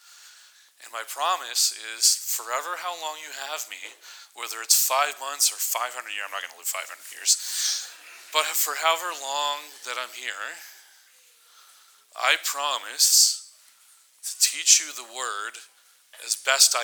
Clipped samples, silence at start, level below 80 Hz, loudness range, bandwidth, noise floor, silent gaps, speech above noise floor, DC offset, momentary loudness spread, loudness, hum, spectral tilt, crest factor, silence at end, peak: under 0.1%; 0.1 s; under -90 dBFS; 8 LU; over 20 kHz; -57 dBFS; none; 31 dB; under 0.1%; 19 LU; -23 LUFS; none; 5 dB/octave; 26 dB; 0 s; -2 dBFS